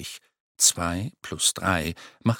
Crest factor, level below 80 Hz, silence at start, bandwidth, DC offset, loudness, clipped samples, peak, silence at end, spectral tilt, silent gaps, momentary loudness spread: 20 dB; -50 dBFS; 0 s; 17.5 kHz; under 0.1%; -23 LUFS; under 0.1%; -6 dBFS; 0 s; -2.5 dB/octave; 0.40-0.55 s; 16 LU